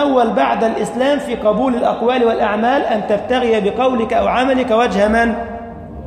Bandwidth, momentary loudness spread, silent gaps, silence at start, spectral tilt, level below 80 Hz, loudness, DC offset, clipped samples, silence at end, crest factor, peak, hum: 13.5 kHz; 4 LU; none; 0 s; -5.5 dB/octave; -40 dBFS; -15 LUFS; under 0.1%; under 0.1%; 0 s; 14 dB; -2 dBFS; none